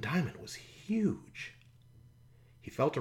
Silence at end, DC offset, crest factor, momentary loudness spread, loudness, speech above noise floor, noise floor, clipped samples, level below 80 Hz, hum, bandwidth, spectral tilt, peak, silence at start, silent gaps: 0 s; under 0.1%; 20 dB; 14 LU; -37 LUFS; 26 dB; -60 dBFS; under 0.1%; -64 dBFS; none; 16.5 kHz; -6.5 dB/octave; -18 dBFS; 0 s; none